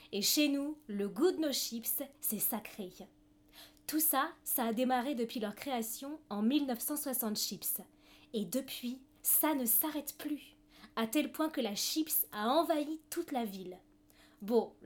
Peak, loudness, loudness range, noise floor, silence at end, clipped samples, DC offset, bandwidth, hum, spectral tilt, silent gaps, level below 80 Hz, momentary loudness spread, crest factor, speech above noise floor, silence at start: -18 dBFS; -34 LUFS; 3 LU; -64 dBFS; 0 s; under 0.1%; under 0.1%; over 20 kHz; none; -2.5 dB/octave; none; -72 dBFS; 13 LU; 18 dB; 29 dB; 0 s